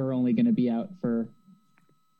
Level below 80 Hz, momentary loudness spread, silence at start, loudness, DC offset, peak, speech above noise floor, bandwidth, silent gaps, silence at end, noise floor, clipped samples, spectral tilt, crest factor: -70 dBFS; 8 LU; 0 s; -27 LUFS; under 0.1%; -14 dBFS; 41 dB; 4.6 kHz; none; 0.95 s; -67 dBFS; under 0.1%; -10.5 dB/octave; 14 dB